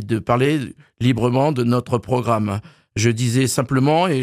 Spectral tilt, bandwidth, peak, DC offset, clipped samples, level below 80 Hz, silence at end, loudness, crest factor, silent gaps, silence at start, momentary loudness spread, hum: -6 dB/octave; 14.5 kHz; -4 dBFS; under 0.1%; under 0.1%; -52 dBFS; 0 s; -19 LUFS; 14 dB; none; 0 s; 7 LU; none